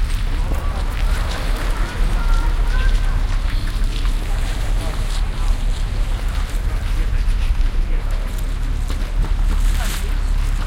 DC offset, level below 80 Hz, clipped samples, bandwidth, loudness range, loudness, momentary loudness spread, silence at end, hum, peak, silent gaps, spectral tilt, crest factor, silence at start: under 0.1%; -18 dBFS; under 0.1%; 14.5 kHz; 2 LU; -23 LUFS; 3 LU; 0 s; none; -6 dBFS; none; -5 dB/octave; 12 dB; 0 s